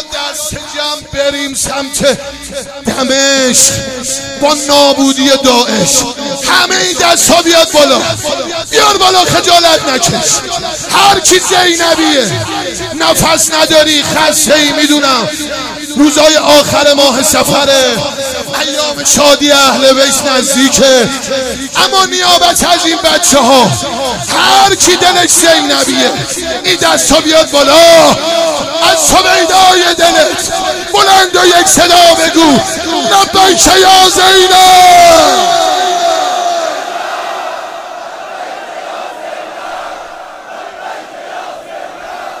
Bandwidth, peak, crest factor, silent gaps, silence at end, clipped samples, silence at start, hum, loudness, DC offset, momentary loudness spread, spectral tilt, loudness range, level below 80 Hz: over 20 kHz; 0 dBFS; 8 dB; none; 0 s; 2%; 0 s; none; -7 LUFS; under 0.1%; 18 LU; -1.5 dB/octave; 9 LU; -38 dBFS